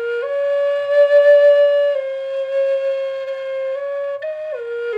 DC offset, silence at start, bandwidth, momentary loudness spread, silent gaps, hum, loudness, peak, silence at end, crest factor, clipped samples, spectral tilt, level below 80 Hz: under 0.1%; 0 s; 5.4 kHz; 14 LU; none; none; -17 LUFS; -4 dBFS; 0 s; 12 dB; under 0.1%; -1.5 dB/octave; -78 dBFS